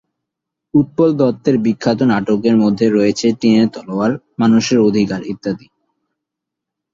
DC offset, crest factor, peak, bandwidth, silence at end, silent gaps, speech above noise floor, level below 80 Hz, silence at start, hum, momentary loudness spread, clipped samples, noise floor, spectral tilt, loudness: under 0.1%; 14 dB; -2 dBFS; 7.6 kHz; 1.35 s; none; 67 dB; -52 dBFS; 0.75 s; none; 7 LU; under 0.1%; -81 dBFS; -6.5 dB/octave; -15 LUFS